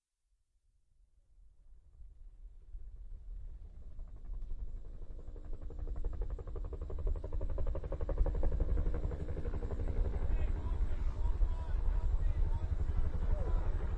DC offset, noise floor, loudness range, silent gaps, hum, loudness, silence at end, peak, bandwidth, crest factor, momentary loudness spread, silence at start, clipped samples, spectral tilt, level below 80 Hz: under 0.1%; -79 dBFS; 17 LU; none; none; -40 LUFS; 0 s; -18 dBFS; 4.1 kHz; 16 dB; 17 LU; 1.65 s; under 0.1%; -9 dB/octave; -36 dBFS